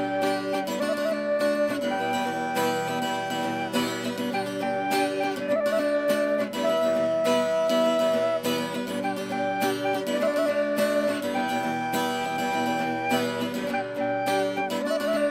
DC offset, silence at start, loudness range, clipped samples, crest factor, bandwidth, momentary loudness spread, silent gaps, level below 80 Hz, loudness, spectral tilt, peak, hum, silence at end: under 0.1%; 0 s; 3 LU; under 0.1%; 14 dB; 16 kHz; 5 LU; none; -68 dBFS; -26 LUFS; -4 dB/octave; -12 dBFS; none; 0 s